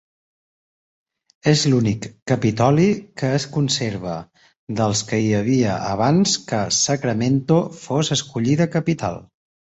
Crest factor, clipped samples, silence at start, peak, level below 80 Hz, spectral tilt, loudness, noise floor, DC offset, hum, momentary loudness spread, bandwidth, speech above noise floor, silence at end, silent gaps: 18 dB; under 0.1%; 1.45 s; -2 dBFS; -52 dBFS; -5 dB/octave; -20 LUFS; under -90 dBFS; under 0.1%; none; 9 LU; 8.2 kHz; over 71 dB; 0.5 s; 2.22-2.26 s, 4.57-4.67 s